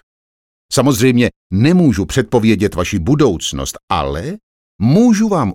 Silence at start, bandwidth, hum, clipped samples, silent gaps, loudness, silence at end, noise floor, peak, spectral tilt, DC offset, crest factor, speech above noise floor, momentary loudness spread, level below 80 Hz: 0.7 s; 17 kHz; none; under 0.1%; 1.36-1.50 s, 3.83-3.88 s, 4.43-4.79 s; -14 LUFS; 0 s; under -90 dBFS; -2 dBFS; -6 dB/octave; under 0.1%; 14 dB; over 77 dB; 10 LU; -36 dBFS